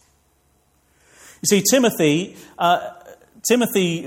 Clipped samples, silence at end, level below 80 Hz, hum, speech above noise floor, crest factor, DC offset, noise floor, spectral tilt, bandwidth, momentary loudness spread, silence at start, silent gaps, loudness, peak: under 0.1%; 0 s; -64 dBFS; none; 43 dB; 18 dB; under 0.1%; -62 dBFS; -3.5 dB/octave; 16.5 kHz; 11 LU; 1.45 s; none; -18 LUFS; -4 dBFS